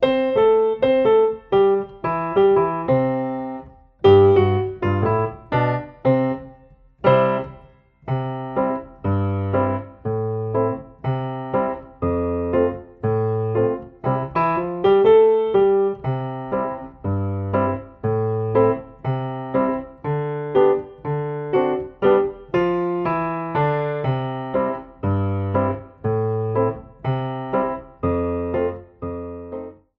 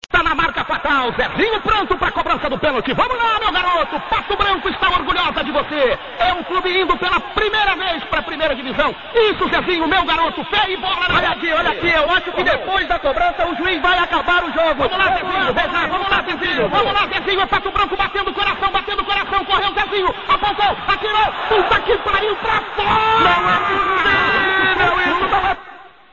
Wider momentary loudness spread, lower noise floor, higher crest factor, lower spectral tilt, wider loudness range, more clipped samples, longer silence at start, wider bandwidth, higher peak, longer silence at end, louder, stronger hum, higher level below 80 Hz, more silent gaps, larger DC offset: first, 10 LU vs 5 LU; first, -50 dBFS vs -40 dBFS; about the same, 16 dB vs 16 dB; first, -10 dB/octave vs -5 dB/octave; first, 6 LU vs 3 LU; neither; about the same, 0 s vs 0.1 s; second, 5.2 kHz vs 7.4 kHz; second, -4 dBFS vs 0 dBFS; about the same, 0.25 s vs 0.25 s; second, -21 LUFS vs -16 LUFS; neither; second, -48 dBFS vs -38 dBFS; neither; second, under 0.1% vs 0.4%